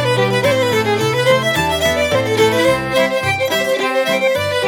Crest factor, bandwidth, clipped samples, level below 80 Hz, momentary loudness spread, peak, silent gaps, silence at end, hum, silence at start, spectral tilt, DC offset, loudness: 14 dB; 19 kHz; under 0.1%; -42 dBFS; 2 LU; -2 dBFS; none; 0 s; none; 0 s; -4 dB/octave; under 0.1%; -15 LUFS